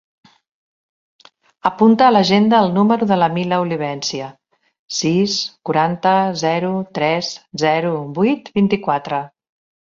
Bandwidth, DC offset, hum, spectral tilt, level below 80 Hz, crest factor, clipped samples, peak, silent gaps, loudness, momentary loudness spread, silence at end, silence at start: 7.6 kHz; under 0.1%; none; -5.5 dB/octave; -60 dBFS; 18 dB; under 0.1%; 0 dBFS; 4.79-4.88 s; -17 LUFS; 11 LU; 0.7 s; 1.65 s